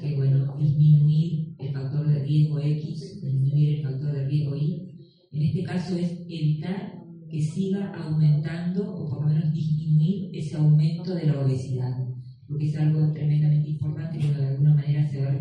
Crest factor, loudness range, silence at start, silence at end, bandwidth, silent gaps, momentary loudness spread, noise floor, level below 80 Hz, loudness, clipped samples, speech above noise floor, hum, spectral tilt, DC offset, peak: 14 dB; 5 LU; 0 s; 0 s; 5.4 kHz; none; 11 LU; -45 dBFS; -60 dBFS; -25 LUFS; under 0.1%; 22 dB; none; -9.5 dB/octave; under 0.1%; -10 dBFS